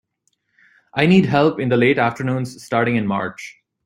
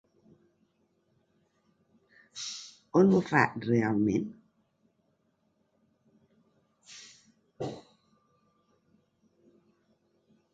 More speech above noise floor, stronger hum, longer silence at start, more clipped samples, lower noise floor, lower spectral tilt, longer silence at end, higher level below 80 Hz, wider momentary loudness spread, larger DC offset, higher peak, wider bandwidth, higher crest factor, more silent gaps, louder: about the same, 51 dB vs 48 dB; neither; second, 0.95 s vs 2.35 s; neither; second, -69 dBFS vs -74 dBFS; about the same, -7 dB/octave vs -6 dB/octave; second, 0.35 s vs 2.75 s; first, -56 dBFS vs -68 dBFS; second, 13 LU vs 25 LU; neither; first, 0 dBFS vs -10 dBFS; first, 11.5 kHz vs 7.8 kHz; second, 18 dB vs 24 dB; neither; first, -18 LUFS vs -28 LUFS